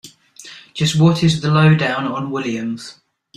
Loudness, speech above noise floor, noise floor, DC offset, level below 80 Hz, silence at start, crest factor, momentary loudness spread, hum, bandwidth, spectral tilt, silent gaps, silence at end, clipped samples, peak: -16 LUFS; 25 dB; -41 dBFS; under 0.1%; -52 dBFS; 0.05 s; 16 dB; 20 LU; none; 10.5 kHz; -6 dB/octave; none; 0.45 s; under 0.1%; -2 dBFS